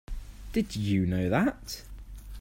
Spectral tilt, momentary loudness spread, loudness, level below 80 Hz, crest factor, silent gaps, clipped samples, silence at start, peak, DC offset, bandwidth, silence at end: -6.5 dB/octave; 20 LU; -29 LUFS; -42 dBFS; 18 dB; none; under 0.1%; 0.1 s; -12 dBFS; under 0.1%; 16 kHz; 0 s